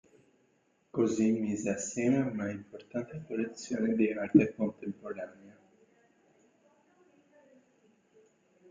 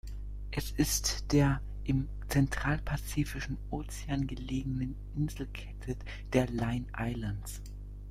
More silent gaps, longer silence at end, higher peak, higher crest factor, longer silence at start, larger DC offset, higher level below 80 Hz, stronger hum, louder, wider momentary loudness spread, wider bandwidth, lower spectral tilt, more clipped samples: neither; first, 3.2 s vs 0 s; about the same, -10 dBFS vs -12 dBFS; about the same, 24 dB vs 22 dB; first, 0.95 s vs 0.05 s; neither; second, -72 dBFS vs -40 dBFS; second, none vs 50 Hz at -40 dBFS; about the same, -32 LUFS vs -34 LUFS; first, 15 LU vs 12 LU; second, 9.6 kHz vs 16 kHz; first, -6.5 dB/octave vs -5 dB/octave; neither